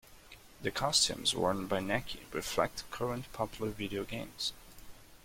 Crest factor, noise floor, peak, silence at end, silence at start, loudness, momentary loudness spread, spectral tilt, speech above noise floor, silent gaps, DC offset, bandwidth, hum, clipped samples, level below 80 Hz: 22 dB; -55 dBFS; -14 dBFS; 0.05 s; 0.05 s; -34 LUFS; 11 LU; -3 dB/octave; 21 dB; none; under 0.1%; 16.5 kHz; none; under 0.1%; -56 dBFS